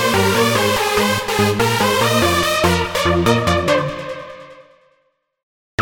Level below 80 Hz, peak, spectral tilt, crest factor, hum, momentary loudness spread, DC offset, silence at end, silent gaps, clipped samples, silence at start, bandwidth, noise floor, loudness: -40 dBFS; 0 dBFS; -4 dB/octave; 16 dB; none; 12 LU; under 0.1%; 0 s; 5.43-5.78 s; under 0.1%; 0 s; over 20 kHz; -64 dBFS; -16 LUFS